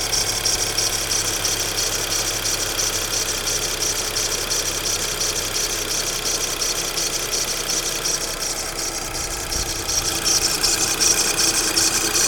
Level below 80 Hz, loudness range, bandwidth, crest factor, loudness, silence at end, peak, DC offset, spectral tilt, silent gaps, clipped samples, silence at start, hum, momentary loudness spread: -38 dBFS; 3 LU; 19.5 kHz; 18 dB; -19 LUFS; 0 s; -4 dBFS; under 0.1%; -0.5 dB/octave; none; under 0.1%; 0 s; none; 6 LU